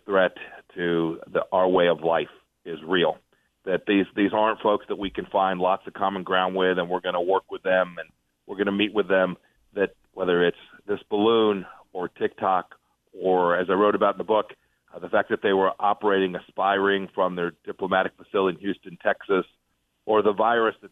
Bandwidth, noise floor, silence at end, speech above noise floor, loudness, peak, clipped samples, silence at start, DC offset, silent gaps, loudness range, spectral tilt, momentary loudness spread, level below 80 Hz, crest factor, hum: 4 kHz; -73 dBFS; 0.05 s; 49 dB; -24 LUFS; -8 dBFS; under 0.1%; 0.1 s; under 0.1%; none; 2 LU; -7.5 dB/octave; 13 LU; -64 dBFS; 16 dB; none